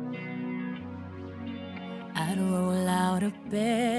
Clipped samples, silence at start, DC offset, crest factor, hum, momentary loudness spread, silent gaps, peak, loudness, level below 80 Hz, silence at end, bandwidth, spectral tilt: under 0.1%; 0 s; under 0.1%; 16 dB; none; 13 LU; none; -14 dBFS; -31 LUFS; -64 dBFS; 0 s; 11 kHz; -6 dB/octave